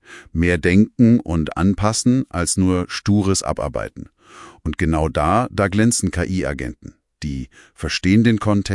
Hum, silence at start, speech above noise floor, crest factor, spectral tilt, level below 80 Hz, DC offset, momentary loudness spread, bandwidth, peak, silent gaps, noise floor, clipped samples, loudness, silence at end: none; 0.1 s; 25 dB; 16 dB; -5.5 dB/octave; -38 dBFS; under 0.1%; 14 LU; 12 kHz; -2 dBFS; none; -43 dBFS; under 0.1%; -18 LUFS; 0 s